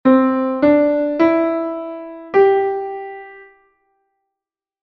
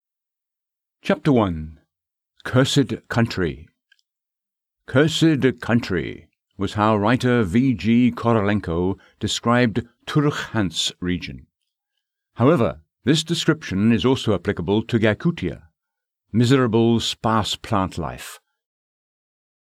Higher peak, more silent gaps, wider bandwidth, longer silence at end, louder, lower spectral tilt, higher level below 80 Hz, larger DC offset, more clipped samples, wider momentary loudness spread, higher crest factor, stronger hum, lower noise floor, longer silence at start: about the same, -2 dBFS vs -4 dBFS; neither; second, 5.8 kHz vs 14 kHz; about the same, 1.4 s vs 1.3 s; first, -16 LUFS vs -21 LUFS; first, -8 dB/octave vs -6 dB/octave; second, -58 dBFS vs -48 dBFS; neither; neither; first, 16 LU vs 11 LU; about the same, 16 dB vs 18 dB; neither; about the same, -86 dBFS vs -87 dBFS; second, 0.05 s vs 1.05 s